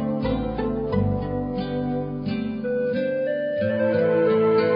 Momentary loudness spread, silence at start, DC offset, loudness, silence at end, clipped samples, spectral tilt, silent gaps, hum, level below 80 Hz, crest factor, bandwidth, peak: 8 LU; 0 s; under 0.1%; -24 LUFS; 0 s; under 0.1%; -11 dB/octave; none; none; -42 dBFS; 14 dB; 5.4 kHz; -10 dBFS